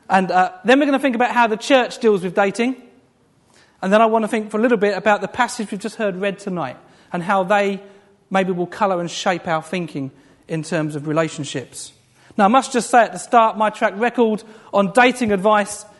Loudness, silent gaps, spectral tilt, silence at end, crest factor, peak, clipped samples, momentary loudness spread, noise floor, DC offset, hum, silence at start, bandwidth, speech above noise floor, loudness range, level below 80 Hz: -18 LUFS; none; -5 dB/octave; 0.15 s; 18 dB; 0 dBFS; under 0.1%; 13 LU; -57 dBFS; under 0.1%; none; 0.1 s; 11.5 kHz; 39 dB; 6 LU; -62 dBFS